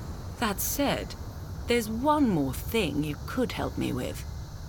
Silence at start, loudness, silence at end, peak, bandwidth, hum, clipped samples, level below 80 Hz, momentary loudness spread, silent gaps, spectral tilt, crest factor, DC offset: 0 s; -29 LUFS; 0 s; -12 dBFS; 18 kHz; none; under 0.1%; -42 dBFS; 14 LU; none; -5 dB/octave; 16 dB; under 0.1%